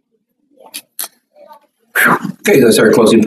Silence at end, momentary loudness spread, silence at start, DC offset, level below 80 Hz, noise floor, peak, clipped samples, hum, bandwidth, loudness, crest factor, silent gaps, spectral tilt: 0 s; 20 LU; 0.75 s; under 0.1%; -56 dBFS; -64 dBFS; 0 dBFS; under 0.1%; none; 15.5 kHz; -10 LUFS; 14 dB; none; -4.5 dB/octave